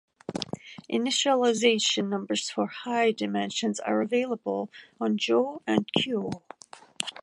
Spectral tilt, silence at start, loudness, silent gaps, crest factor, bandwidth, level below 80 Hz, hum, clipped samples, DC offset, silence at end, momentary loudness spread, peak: -3.5 dB/octave; 0.3 s; -27 LUFS; none; 22 dB; 11.5 kHz; -70 dBFS; none; under 0.1%; under 0.1%; 0 s; 14 LU; -6 dBFS